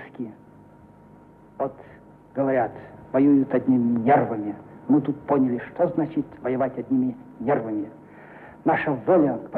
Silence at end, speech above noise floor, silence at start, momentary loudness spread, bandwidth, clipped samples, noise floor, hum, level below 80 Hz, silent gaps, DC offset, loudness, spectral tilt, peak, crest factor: 0 s; 27 dB; 0 s; 16 LU; 3.9 kHz; under 0.1%; -50 dBFS; none; -62 dBFS; none; under 0.1%; -23 LUFS; -10.5 dB/octave; -8 dBFS; 16 dB